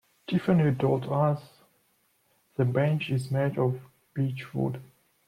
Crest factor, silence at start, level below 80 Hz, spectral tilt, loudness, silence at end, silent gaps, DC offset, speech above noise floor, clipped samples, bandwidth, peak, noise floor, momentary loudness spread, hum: 16 dB; 0.3 s; -64 dBFS; -8.5 dB/octave; -28 LUFS; 0.45 s; none; under 0.1%; 43 dB; under 0.1%; 14 kHz; -12 dBFS; -69 dBFS; 11 LU; none